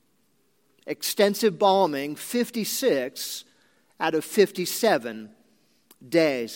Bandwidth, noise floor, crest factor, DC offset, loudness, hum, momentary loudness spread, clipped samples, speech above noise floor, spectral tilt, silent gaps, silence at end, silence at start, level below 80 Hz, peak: 17 kHz; -68 dBFS; 20 dB; under 0.1%; -24 LUFS; none; 13 LU; under 0.1%; 44 dB; -3.5 dB/octave; none; 0 s; 0.85 s; -82 dBFS; -6 dBFS